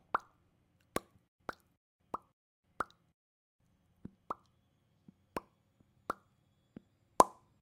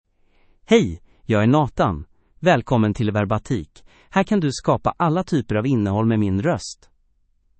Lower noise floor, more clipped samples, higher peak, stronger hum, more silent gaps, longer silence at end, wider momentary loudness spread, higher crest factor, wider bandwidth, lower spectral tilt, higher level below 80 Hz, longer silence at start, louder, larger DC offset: first, -74 dBFS vs -62 dBFS; neither; second, -4 dBFS vs 0 dBFS; neither; first, 1.28-1.39 s, 1.77-1.99 s, 2.33-2.63 s, 3.14-3.59 s vs none; second, 0.35 s vs 0.85 s; first, 27 LU vs 9 LU; first, 38 dB vs 20 dB; first, 15.5 kHz vs 8.8 kHz; second, -3.5 dB/octave vs -7 dB/octave; second, -70 dBFS vs -46 dBFS; second, 0.15 s vs 0.7 s; second, -38 LUFS vs -20 LUFS; neither